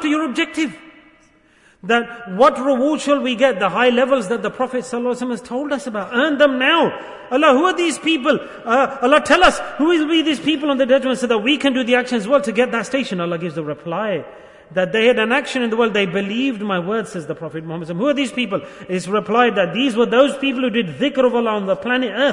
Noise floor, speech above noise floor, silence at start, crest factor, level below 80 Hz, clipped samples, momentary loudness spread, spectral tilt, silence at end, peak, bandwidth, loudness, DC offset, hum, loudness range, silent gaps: -53 dBFS; 36 dB; 0 s; 16 dB; -52 dBFS; under 0.1%; 10 LU; -4.5 dB/octave; 0 s; 0 dBFS; 11 kHz; -18 LUFS; under 0.1%; none; 4 LU; none